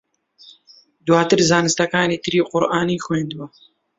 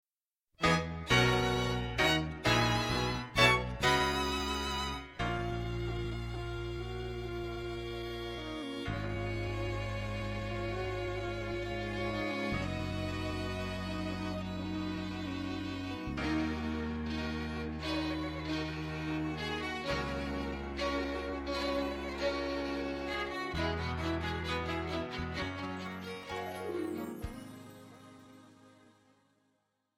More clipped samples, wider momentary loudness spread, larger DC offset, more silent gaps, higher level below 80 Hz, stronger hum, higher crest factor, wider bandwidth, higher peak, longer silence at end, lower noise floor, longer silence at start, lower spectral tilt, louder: neither; first, 14 LU vs 11 LU; neither; neither; second, -54 dBFS vs -46 dBFS; neither; second, 18 dB vs 24 dB; second, 8 kHz vs 16 kHz; first, -2 dBFS vs -10 dBFS; second, 0.5 s vs 1.25 s; second, -52 dBFS vs under -90 dBFS; second, 0.45 s vs 0.6 s; about the same, -4.5 dB/octave vs -5 dB/octave; first, -18 LUFS vs -35 LUFS